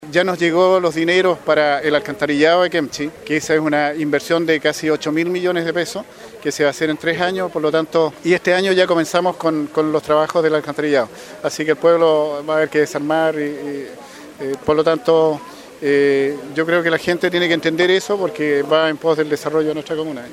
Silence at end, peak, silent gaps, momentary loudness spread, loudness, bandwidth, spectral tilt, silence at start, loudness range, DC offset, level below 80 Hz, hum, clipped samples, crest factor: 0 s; 0 dBFS; none; 10 LU; -17 LUFS; 15.5 kHz; -4.5 dB/octave; 0 s; 2 LU; under 0.1%; -58 dBFS; none; under 0.1%; 18 dB